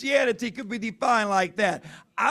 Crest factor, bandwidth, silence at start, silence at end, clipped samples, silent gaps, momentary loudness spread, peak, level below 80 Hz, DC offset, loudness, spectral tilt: 16 dB; 14 kHz; 0 s; 0 s; under 0.1%; none; 10 LU; -8 dBFS; -68 dBFS; under 0.1%; -25 LUFS; -4 dB/octave